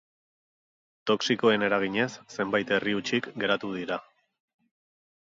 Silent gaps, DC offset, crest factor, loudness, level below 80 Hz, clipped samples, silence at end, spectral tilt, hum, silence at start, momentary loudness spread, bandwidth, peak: none; under 0.1%; 20 dB; -27 LUFS; -70 dBFS; under 0.1%; 1.2 s; -4.5 dB/octave; none; 1.05 s; 10 LU; 7.8 kHz; -10 dBFS